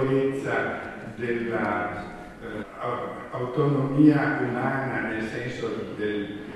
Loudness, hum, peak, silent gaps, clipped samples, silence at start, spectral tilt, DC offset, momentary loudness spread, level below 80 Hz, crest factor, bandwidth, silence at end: -26 LUFS; none; -6 dBFS; none; under 0.1%; 0 s; -8 dB/octave; under 0.1%; 16 LU; -54 dBFS; 20 dB; 11.5 kHz; 0 s